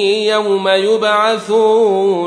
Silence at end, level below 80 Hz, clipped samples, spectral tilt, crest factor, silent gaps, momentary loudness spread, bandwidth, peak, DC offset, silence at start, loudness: 0 s; -64 dBFS; under 0.1%; -4 dB/octave; 12 dB; none; 3 LU; 10.5 kHz; -2 dBFS; under 0.1%; 0 s; -13 LUFS